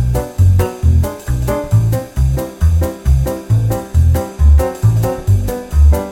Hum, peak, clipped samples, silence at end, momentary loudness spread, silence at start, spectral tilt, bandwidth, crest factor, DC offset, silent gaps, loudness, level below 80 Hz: none; -2 dBFS; under 0.1%; 0 s; 5 LU; 0 s; -7.5 dB/octave; 16.5 kHz; 10 dB; under 0.1%; none; -15 LUFS; -16 dBFS